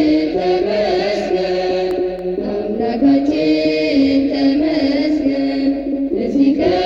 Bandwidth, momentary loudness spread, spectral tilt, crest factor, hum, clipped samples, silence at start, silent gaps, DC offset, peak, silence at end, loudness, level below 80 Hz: 7.2 kHz; 6 LU; -6.5 dB/octave; 12 dB; none; under 0.1%; 0 s; none; under 0.1%; -4 dBFS; 0 s; -16 LUFS; -42 dBFS